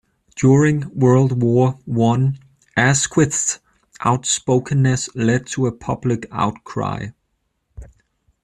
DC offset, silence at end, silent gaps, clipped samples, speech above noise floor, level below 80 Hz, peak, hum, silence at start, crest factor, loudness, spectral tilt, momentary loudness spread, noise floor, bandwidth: under 0.1%; 0.6 s; none; under 0.1%; 53 dB; -48 dBFS; -2 dBFS; none; 0.35 s; 16 dB; -18 LUFS; -5.5 dB/octave; 10 LU; -70 dBFS; 11 kHz